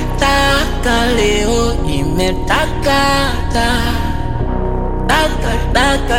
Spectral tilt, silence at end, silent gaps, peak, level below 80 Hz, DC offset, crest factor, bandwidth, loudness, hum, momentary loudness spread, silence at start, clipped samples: -4.5 dB/octave; 0 s; none; 0 dBFS; -18 dBFS; under 0.1%; 14 dB; 16.5 kHz; -15 LUFS; none; 7 LU; 0 s; under 0.1%